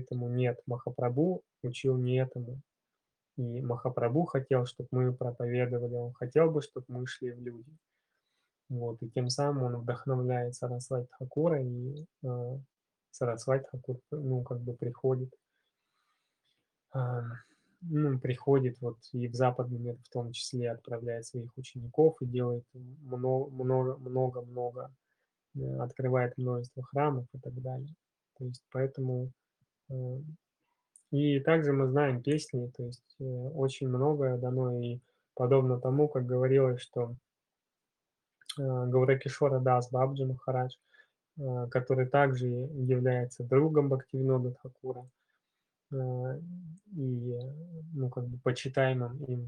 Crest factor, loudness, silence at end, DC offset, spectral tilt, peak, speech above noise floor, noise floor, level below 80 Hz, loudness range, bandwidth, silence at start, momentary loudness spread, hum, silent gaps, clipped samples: 20 dB; -32 LUFS; 0 s; under 0.1%; -7.5 dB/octave; -12 dBFS; 58 dB; -89 dBFS; -74 dBFS; 7 LU; 10.5 kHz; 0 s; 15 LU; none; none; under 0.1%